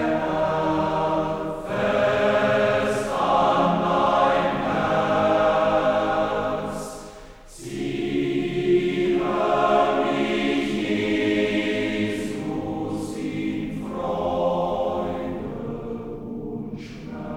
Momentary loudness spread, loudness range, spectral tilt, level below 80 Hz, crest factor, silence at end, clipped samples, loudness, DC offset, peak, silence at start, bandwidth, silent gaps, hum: 13 LU; 6 LU; -6 dB/octave; -46 dBFS; 16 dB; 0 s; under 0.1%; -23 LUFS; under 0.1%; -6 dBFS; 0 s; 15 kHz; none; none